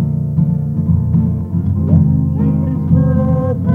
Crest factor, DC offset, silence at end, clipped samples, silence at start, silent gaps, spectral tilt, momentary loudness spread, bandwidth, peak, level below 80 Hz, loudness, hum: 14 dB; under 0.1%; 0 s; under 0.1%; 0 s; none; -12.5 dB/octave; 5 LU; 2.2 kHz; 0 dBFS; -30 dBFS; -14 LUFS; none